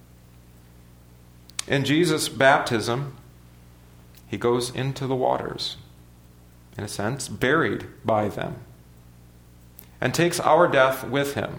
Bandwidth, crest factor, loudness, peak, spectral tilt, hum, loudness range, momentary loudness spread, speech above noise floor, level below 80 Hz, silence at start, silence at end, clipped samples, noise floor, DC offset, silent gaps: over 20 kHz; 22 dB; -23 LUFS; -2 dBFS; -4.5 dB/octave; 60 Hz at -50 dBFS; 5 LU; 16 LU; 27 dB; -54 dBFS; 1.6 s; 0 s; under 0.1%; -50 dBFS; under 0.1%; none